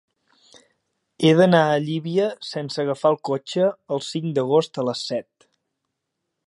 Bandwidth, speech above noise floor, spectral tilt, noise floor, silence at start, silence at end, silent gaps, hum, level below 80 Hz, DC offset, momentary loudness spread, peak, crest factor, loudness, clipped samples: 11.5 kHz; 59 dB; -6 dB/octave; -80 dBFS; 1.2 s; 1.25 s; none; none; -70 dBFS; under 0.1%; 12 LU; -2 dBFS; 20 dB; -21 LUFS; under 0.1%